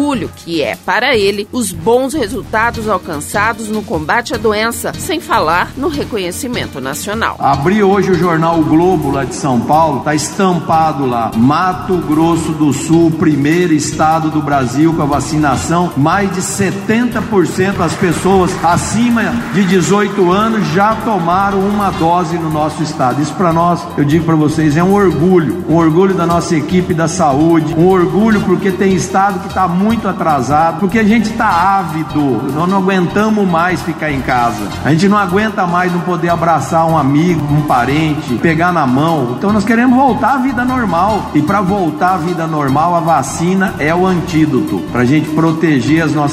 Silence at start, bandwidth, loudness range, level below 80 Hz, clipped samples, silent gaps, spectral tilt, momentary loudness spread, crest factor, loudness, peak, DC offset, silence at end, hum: 0 s; 16 kHz; 3 LU; -38 dBFS; under 0.1%; none; -6 dB/octave; 6 LU; 12 dB; -12 LUFS; 0 dBFS; under 0.1%; 0 s; none